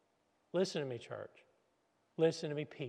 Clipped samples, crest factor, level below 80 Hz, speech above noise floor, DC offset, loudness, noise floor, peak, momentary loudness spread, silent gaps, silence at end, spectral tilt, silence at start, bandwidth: under 0.1%; 20 dB; -88 dBFS; 40 dB; under 0.1%; -38 LUFS; -77 dBFS; -20 dBFS; 15 LU; none; 0 s; -5.5 dB/octave; 0.55 s; 10.5 kHz